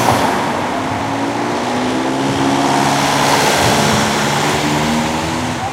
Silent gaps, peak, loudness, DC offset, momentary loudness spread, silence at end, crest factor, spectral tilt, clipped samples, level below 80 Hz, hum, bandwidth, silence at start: none; 0 dBFS; -15 LUFS; under 0.1%; 6 LU; 0 s; 14 dB; -4 dB/octave; under 0.1%; -40 dBFS; none; 16 kHz; 0 s